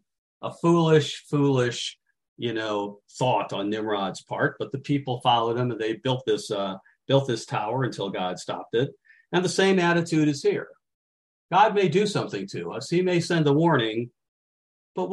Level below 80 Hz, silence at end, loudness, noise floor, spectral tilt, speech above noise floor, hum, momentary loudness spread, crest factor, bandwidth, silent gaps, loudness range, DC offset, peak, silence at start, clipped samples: -68 dBFS; 0 s; -25 LUFS; under -90 dBFS; -5.5 dB/octave; over 66 dB; none; 12 LU; 18 dB; 12 kHz; 2.28-2.36 s, 10.94-11.49 s, 14.28-14.95 s; 4 LU; under 0.1%; -8 dBFS; 0.4 s; under 0.1%